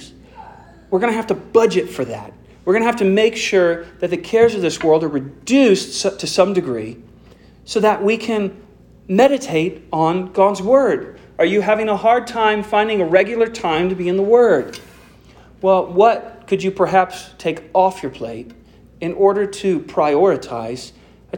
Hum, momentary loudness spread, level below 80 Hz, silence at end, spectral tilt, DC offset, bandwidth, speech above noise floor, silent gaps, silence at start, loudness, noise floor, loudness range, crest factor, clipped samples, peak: none; 12 LU; -52 dBFS; 0 s; -5 dB/octave; under 0.1%; 17 kHz; 29 dB; none; 0 s; -17 LUFS; -45 dBFS; 3 LU; 16 dB; under 0.1%; -2 dBFS